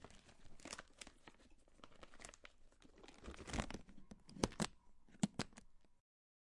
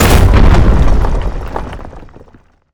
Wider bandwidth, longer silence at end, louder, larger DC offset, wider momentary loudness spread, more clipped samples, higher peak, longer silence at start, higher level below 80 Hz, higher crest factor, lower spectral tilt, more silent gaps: second, 11.5 kHz vs over 20 kHz; second, 0.5 s vs 0.7 s; second, -48 LUFS vs -12 LUFS; neither; about the same, 22 LU vs 20 LU; neither; second, -16 dBFS vs 0 dBFS; about the same, 0 s vs 0 s; second, -62 dBFS vs -12 dBFS; first, 34 dB vs 10 dB; second, -4 dB/octave vs -6 dB/octave; neither